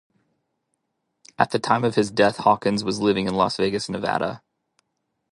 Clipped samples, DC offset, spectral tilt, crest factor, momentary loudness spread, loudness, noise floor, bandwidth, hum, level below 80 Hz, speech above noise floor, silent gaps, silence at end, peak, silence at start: under 0.1%; under 0.1%; -5 dB/octave; 22 dB; 6 LU; -22 LUFS; -76 dBFS; 11.5 kHz; none; -58 dBFS; 55 dB; none; 0.95 s; -2 dBFS; 1.4 s